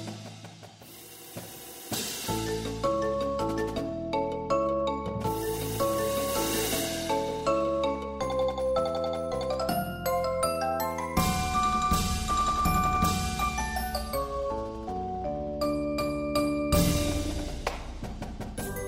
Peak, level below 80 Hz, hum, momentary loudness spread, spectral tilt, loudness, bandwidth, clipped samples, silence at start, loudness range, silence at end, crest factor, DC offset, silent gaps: -12 dBFS; -40 dBFS; none; 13 LU; -4.5 dB/octave; -29 LUFS; 16 kHz; under 0.1%; 0 s; 4 LU; 0 s; 18 dB; under 0.1%; none